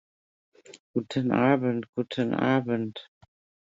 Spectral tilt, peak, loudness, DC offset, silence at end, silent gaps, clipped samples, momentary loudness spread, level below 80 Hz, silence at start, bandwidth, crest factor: -7.5 dB/octave; -8 dBFS; -27 LUFS; under 0.1%; 0.6 s; 0.80-0.94 s, 1.89-1.93 s; under 0.1%; 11 LU; -66 dBFS; 0.7 s; 7.8 kHz; 20 dB